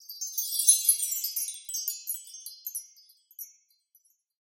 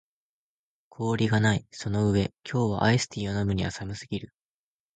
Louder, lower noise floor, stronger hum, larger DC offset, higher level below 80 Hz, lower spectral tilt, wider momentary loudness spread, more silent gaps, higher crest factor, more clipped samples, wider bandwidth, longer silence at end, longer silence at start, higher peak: about the same, -26 LUFS vs -27 LUFS; second, -68 dBFS vs under -90 dBFS; neither; neither; second, under -90 dBFS vs -48 dBFS; second, 12 dB/octave vs -6 dB/octave; first, 23 LU vs 11 LU; neither; first, 26 dB vs 18 dB; neither; first, 17 kHz vs 9.2 kHz; first, 1.05 s vs 0.7 s; second, 0 s vs 1 s; first, -6 dBFS vs -10 dBFS